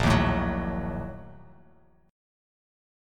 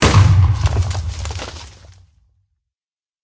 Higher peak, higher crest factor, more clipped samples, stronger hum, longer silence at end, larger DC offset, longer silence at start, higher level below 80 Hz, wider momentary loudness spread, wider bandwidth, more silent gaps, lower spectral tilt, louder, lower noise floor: second, -10 dBFS vs 0 dBFS; about the same, 20 dB vs 18 dB; neither; neither; second, 1 s vs 1.55 s; neither; about the same, 0 s vs 0 s; second, -38 dBFS vs -24 dBFS; about the same, 21 LU vs 19 LU; first, 16 kHz vs 8 kHz; neither; about the same, -6.5 dB/octave vs -5.5 dB/octave; second, -28 LUFS vs -16 LUFS; second, -60 dBFS vs under -90 dBFS